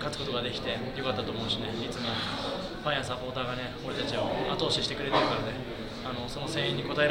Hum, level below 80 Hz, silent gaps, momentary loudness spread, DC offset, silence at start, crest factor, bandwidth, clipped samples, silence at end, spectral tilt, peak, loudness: none; -50 dBFS; none; 8 LU; under 0.1%; 0 s; 20 dB; 17.5 kHz; under 0.1%; 0 s; -4.5 dB/octave; -12 dBFS; -31 LUFS